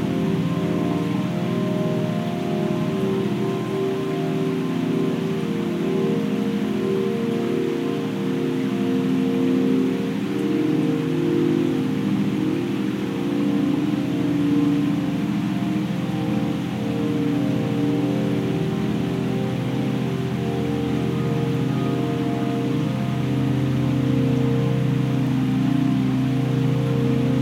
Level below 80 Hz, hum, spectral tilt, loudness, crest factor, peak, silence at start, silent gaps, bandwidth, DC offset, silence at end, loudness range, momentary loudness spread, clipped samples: -52 dBFS; none; -7.5 dB/octave; -22 LUFS; 14 dB; -8 dBFS; 0 s; none; 16 kHz; under 0.1%; 0 s; 2 LU; 4 LU; under 0.1%